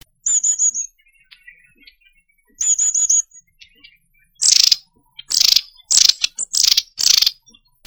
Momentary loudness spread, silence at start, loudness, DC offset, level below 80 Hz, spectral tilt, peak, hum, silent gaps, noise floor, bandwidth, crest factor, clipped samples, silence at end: 9 LU; 0.25 s; -14 LUFS; under 0.1%; -56 dBFS; 5 dB/octave; 0 dBFS; none; none; -58 dBFS; 19.5 kHz; 20 dB; under 0.1%; 0.55 s